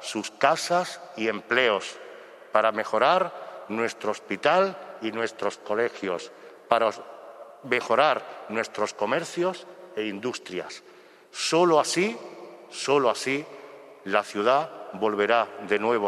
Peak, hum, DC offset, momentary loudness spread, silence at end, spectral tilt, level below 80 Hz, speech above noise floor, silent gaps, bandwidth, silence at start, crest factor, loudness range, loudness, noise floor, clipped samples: -4 dBFS; none; under 0.1%; 19 LU; 0 s; -3.5 dB/octave; -76 dBFS; 19 dB; none; 13.5 kHz; 0 s; 24 dB; 3 LU; -26 LUFS; -45 dBFS; under 0.1%